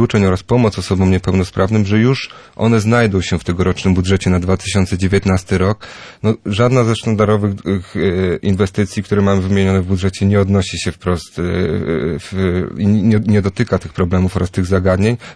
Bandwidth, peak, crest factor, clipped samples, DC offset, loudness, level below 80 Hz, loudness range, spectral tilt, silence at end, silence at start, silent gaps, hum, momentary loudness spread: 11 kHz; -2 dBFS; 14 dB; under 0.1%; under 0.1%; -15 LUFS; -38 dBFS; 2 LU; -6.5 dB/octave; 0 s; 0 s; none; none; 6 LU